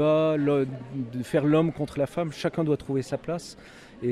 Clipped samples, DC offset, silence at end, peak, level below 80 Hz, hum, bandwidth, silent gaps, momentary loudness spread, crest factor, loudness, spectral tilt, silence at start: under 0.1%; under 0.1%; 0 s; -10 dBFS; -58 dBFS; none; 13 kHz; none; 12 LU; 16 dB; -27 LUFS; -7.5 dB/octave; 0 s